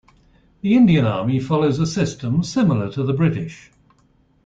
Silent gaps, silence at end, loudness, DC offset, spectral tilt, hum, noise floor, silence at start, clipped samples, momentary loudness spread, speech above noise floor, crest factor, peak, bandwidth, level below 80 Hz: none; 0.9 s; -19 LUFS; under 0.1%; -7 dB/octave; none; -58 dBFS; 0.65 s; under 0.1%; 8 LU; 40 dB; 14 dB; -4 dBFS; 7.8 kHz; -50 dBFS